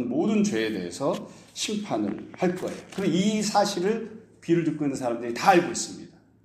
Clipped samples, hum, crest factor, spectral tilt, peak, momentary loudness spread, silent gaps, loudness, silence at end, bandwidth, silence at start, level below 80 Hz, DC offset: under 0.1%; none; 22 dB; -5 dB/octave; -4 dBFS; 12 LU; none; -26 LUFS; 0.35 s; 15 kHz; 0 s; -66 dBFS; under 0.1%